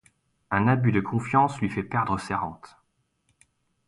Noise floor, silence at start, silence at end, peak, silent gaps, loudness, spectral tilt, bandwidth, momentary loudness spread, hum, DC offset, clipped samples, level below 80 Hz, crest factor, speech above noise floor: -72 dBFS; 0.5 s; 1.2 s; -8 dBFS; none; -25 LUFS; -7.5 dB/octave; 11.5 kHz; 8 LU; none; under 0.1%; under 0.1%; -54 dBFS; 20 dB; 47 dB